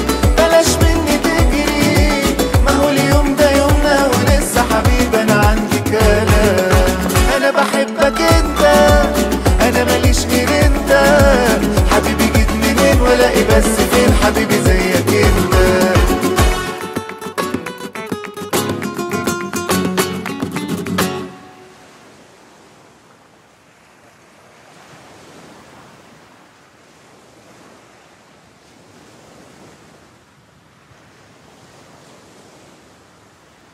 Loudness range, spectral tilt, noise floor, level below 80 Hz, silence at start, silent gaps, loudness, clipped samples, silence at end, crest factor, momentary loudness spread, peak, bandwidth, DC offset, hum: 9 LU; -5 dB/octave; -48 dBFS; -22 dBFS; 0 s; none; -13 LUFS; under 0.1%; 12.35 s; 14 dB; 10 LU; 0 dBFS; 16.5 kHz; under 0.1%; none